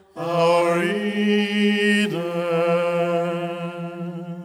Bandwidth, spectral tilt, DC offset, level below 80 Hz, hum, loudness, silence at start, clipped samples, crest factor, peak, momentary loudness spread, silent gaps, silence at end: 15.5 kHz; -6 dB/octave; under 0.1%; -72 dBFS; none; -21 LUFS; 0.15 s; under 0.1%; 14 dB; -6 dBFS; 13 LU; none; 0 s